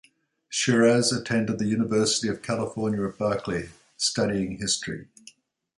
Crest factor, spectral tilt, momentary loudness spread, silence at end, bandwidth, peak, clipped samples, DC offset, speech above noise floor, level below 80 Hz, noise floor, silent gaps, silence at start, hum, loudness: 18 dB; -4 dB/octave; 11 LU; 0.75 s; 11.5 kHz; -8 dBFS; under 0.1%; under 0.1%; 30 dB; -56 dBFS; -54 dBFS; none; 0.5 s; none; -25 LUFS